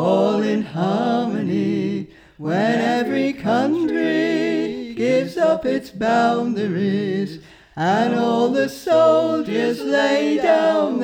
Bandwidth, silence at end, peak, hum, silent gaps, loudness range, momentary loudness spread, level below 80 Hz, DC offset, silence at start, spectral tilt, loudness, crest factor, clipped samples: 16.5 kHz; 0 s; -4 dBFS; none; none; 3 LU; 8 LU; -58 dBFS; under 0.1%; 0 s; -6.5 dB/octave; -19 LUFS; 14 dB; under 0.1%